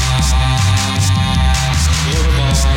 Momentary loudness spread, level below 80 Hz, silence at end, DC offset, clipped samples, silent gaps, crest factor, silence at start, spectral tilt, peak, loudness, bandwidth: 1 LU; -16 dBFS; 0 s; under 0.1%; under 0.1%; none; 10 dB; 0 s; -4 dB/octave; -4 dBFS; -14 LUFS; 16.5 kHz